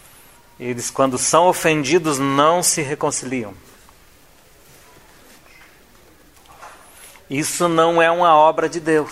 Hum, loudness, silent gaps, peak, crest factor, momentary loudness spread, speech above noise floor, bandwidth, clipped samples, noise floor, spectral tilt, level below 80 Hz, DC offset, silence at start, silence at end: none; -17 LUFS; none; 0 dBFS; 20 dB; 13 LU; 33 dB; 16 kHz; under 0.1%; -50 dBFS; -3.5 dB/octave; -56 dBFS; 0.2%; 0.6 s; 0 s